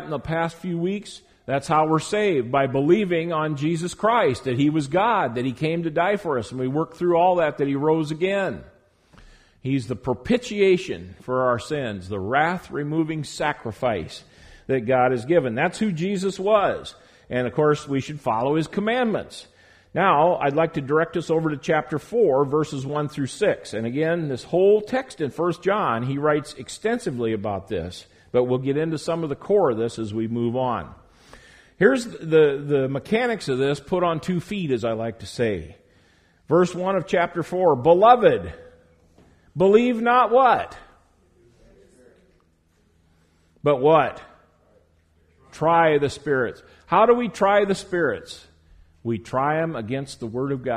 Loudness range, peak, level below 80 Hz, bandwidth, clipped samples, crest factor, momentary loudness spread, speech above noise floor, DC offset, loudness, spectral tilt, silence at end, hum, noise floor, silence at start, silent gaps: 5 LU; -2 dBFS; -54 dBFS; 12.5 kHz; under 0.1%; 20 dB; 11 LU; 41 dB; under 0.1%; -22 LUFS; -6.5 dB/octave; 0 s; none; -62 dBFS; 0 s; none